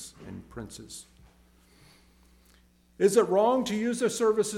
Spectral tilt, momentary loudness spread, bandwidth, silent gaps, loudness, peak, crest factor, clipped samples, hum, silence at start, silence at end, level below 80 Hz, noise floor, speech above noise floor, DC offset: -4.5 dB/octave; 21 LU; 16 kHz; none; -25 LUFS; -10 dBFS; 20 dB; under 0.1%; none; 0 s; 0 s; -60 dBFS; -61 dBFS; 35 dB; under 0.1%